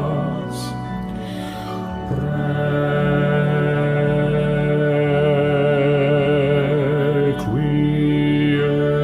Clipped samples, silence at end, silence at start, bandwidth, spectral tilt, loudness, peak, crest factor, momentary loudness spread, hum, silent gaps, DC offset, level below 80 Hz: under 0.1%; 0 s; 0 s; 11.5 kHz; -8 dB/octave; -19 LUFS; -6 dBFS; 12 dB; 10 LU; none; none; under 0.1%; -40 dBFS